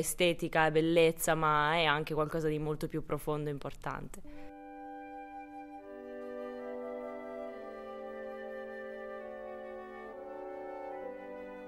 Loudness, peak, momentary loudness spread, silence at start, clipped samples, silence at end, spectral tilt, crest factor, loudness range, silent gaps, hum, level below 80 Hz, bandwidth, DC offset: -34 LUFS; -12 dBFS; 19 LU; 0 s; under 0.1%; 0 s; -4.5 dB/octave; 22 dB; 14 LU; none; none; -56 dBFS; 16 kHz; under 0.1%